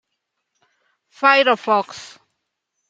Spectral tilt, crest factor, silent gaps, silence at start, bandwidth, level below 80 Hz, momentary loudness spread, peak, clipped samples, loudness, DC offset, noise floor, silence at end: -3 dB/octave; 20 dB; none; 1.2 s; 9 kHz; -78 dBFS; 19 LU; -2 dBFS; under 0.1%; -16 LUFS; under 0.1%; -77 dBFS; 0.85 s